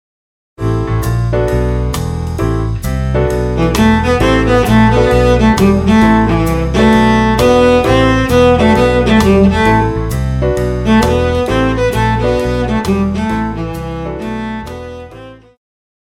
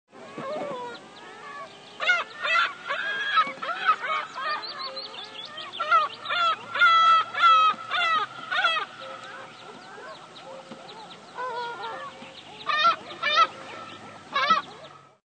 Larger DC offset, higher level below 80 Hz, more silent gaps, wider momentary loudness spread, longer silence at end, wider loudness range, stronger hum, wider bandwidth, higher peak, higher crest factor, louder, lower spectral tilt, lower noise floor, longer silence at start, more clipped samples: neither; first, -22 dBFS vs -86 dBFS; neither; second, 12 LU vs 23 LU; first, 0.7 s vs 0.3 s; second, 7 LU vs 11 LU; neither; first, 16 kHz vs 9.2 kHz; first, 0 dBFS vs -8 dBFS; second, 12 dB vs 18 dB; first, -12 LUFS vs -24 LUFS; first, -6.5 dB/octave vs -1.5 dB/octave; second, -34 dBFS vs -47 dBFS; first, 0.6 s vs 0.15 s; neither